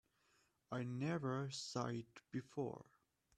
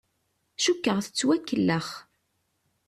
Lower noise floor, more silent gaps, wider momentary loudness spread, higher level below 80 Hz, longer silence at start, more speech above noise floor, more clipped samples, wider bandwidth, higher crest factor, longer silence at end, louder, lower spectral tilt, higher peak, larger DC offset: first, -79 dBFS vs -75 dBFS; neither; second, 8 LU vs 15 LU; second, -80 dBFS vs -68 dBFS; about the same, 0.7 s vs 0.6 s; second, 34 dB vs 49 dB; neither; second, 11.5 kHz vs 14 kHz; about the same, 18 dB vs 16 dB; second, 0.55 s vs 0.85 s; second, -45 LUFS vs -26 LUFS; first, -5.5 dB/octave vs -4 dB/octave; second, -28 dBFS vs -12 dBFS; neither